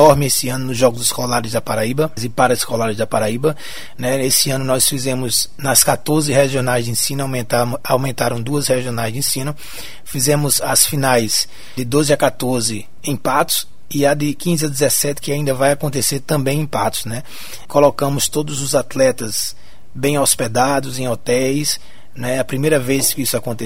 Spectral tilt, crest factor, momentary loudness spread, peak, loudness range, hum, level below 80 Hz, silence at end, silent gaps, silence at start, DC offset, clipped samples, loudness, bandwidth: -3.5 dB/octave; 18 dB; 8 LU; 0 dBFS; 3 LU; none; -46 dBFS; 0 s; none; 0 s; 4%; under 0.1%; -17 LUFS; 16.5 kHz